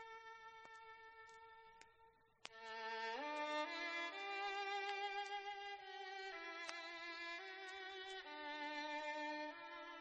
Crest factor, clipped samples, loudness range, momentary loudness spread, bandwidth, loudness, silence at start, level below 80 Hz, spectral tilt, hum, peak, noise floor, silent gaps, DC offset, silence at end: 22 dB; under 0.1%; 5 LU; 16 LU; 8.2 kHz; -47 LUFS; 0 s; -88 dBFS; -1 dB/octave; none; -26 dBFS; -72 dBFS; none; under 0.1%; 0 s